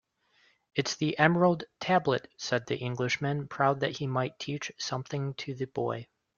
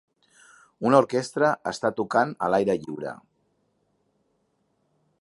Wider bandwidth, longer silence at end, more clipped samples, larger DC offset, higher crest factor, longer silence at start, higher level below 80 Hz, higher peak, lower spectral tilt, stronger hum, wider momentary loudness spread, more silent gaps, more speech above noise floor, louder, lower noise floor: second, 7.2 kHz vs 11.5 kHz; second, 0.35 s vs 2.05 s; neither; neither; about the same, 24 dB vs 24 dB; about the same, 0.75 s vs 0.8 s; about the same, -68 dBFS vs -68 dBFS; second, -6 dBFS vs -2 dBFS; about the same, -5 dB/octave vs -5.5 dB/octave; neither; second, 10 LU vs 14 LU; neither; second, 38 dB vs 48 dB; second, -30 LUFS vs -24 LUFS; about the same, -68 dBFS vs -71 dBFS